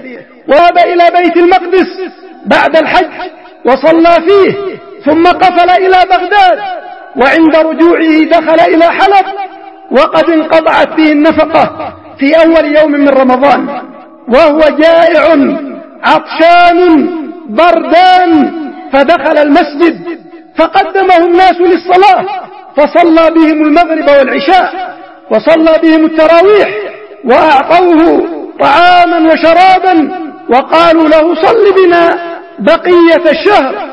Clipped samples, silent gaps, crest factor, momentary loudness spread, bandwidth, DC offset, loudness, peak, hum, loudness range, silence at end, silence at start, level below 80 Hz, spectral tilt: 2%; none; 6 dB; 14 LU; 8.8 kHz; 0.6%; -6 LUFS; 0 dBFS; none; 2 LU; 0 s; 0 s; -40 dBFS; -5.5 dB/octave